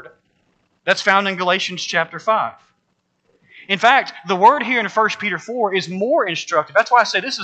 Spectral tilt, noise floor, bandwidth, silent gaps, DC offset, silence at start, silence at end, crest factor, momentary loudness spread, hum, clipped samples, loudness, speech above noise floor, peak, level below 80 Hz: -3.5 dB/octave; -68 dBFS; 8.8 kHz; none; under 0.1%; 0.05 s; 0 s; 18 dB; 8 LU; none; under 0.1%; -17 LUFS; 51 dB; 0 dBFS; -76 dBFS